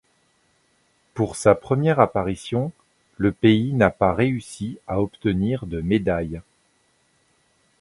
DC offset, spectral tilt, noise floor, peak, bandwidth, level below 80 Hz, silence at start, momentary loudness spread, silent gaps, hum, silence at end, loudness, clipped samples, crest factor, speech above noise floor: under 0.1%; -7 dB/octave; -64 dBFS; 0 dBFS; 11.5 kHz; -46 dBFS; 1.15 s; 12 LU; none; none; 1.4 s; -22 LUFS; under 0.1%; 22 dB; 43 dB